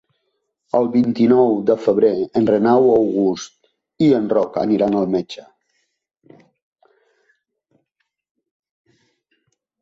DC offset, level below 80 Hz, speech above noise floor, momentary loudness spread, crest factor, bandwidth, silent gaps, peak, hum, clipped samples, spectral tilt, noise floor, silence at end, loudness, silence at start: under 0.1%; -60 dBFS; 58 dB; 9 LU; 16 dB; 7.6 kHz; none; -2 dBFS; none; under 0.1%; -7.5 dB/octave; -74 dBFS; 4.4 s; -17 LUFS; 0.75 s